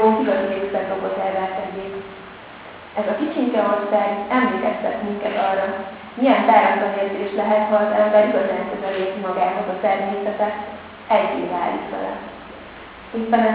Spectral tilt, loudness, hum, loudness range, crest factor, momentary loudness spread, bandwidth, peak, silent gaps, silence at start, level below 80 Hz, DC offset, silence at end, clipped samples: -9 dB/octave; -20 LUFS; none; 6 LU; 20 dB; 18 LU; 4 kHz; 0 dBFS; none; 0 s; -56 dBFS; under 0.1%; 0 s; under 0.1%